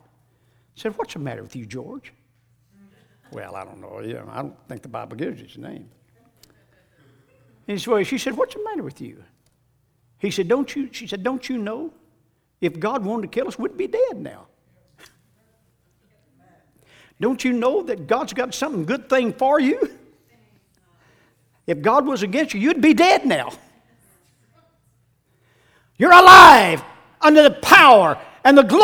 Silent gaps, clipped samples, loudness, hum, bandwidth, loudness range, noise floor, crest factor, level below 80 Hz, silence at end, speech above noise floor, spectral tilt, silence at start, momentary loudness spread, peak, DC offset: none; 0.2%; -15 LUFS; none; over 20 kHz; 25 LU; -64 dBFS; 18 dB; -54 dBFS; 0 s; 48 dB; -4 dB/octave; 0.85 s; 25 LU; 0 dBFS; under 0.1%